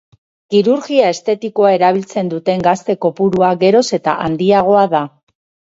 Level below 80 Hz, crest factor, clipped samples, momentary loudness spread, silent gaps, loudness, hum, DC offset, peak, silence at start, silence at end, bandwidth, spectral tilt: -54 dBFS; 14 dB; under 0.1%; 7 LU; none; -14 LUFS; none; under 0.1%; 0 dBFS; 0.5 s; 0.6 s; 8 kHz; -6 dB/octave